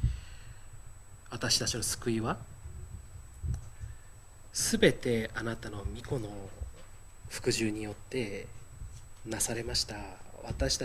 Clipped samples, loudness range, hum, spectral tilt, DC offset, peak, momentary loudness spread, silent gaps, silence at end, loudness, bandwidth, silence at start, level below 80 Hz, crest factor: under 0.1%; 4 LU; none; -3.5 dB/octave; under 0.1%; -10 dBFS; 23 LU; none; 0 s; -33 LUFS; 16 kHz; 0 s; -44 dBFS; 26 dB